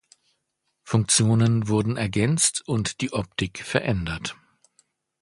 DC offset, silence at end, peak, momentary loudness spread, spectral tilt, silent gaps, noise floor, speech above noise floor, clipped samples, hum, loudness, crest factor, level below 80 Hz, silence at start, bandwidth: under 0.1%; 0.9 s; -4 dBFS; 10 LU; -4.5 dB/octave; none; -76 dBFS; 53 dB; under 0.1%; none; -23 LUFS; 20 dB; -48 dBFS; 0.85 s; 11.5 kHz